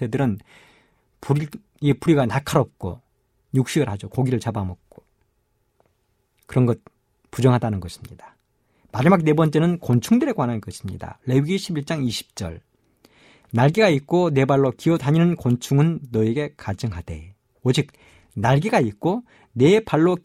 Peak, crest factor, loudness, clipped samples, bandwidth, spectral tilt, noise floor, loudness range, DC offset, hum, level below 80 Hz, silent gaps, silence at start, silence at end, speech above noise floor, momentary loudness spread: -2 dBFS; 18 dB; -21 LUFS; under 0.1%; 14.5 kHz; -7 dB/octave; -68 dBFS; 7 LU; under 0.1%; none; -50 dBFS; none; 0 s; 0.05 s; 48 dB; 16 LU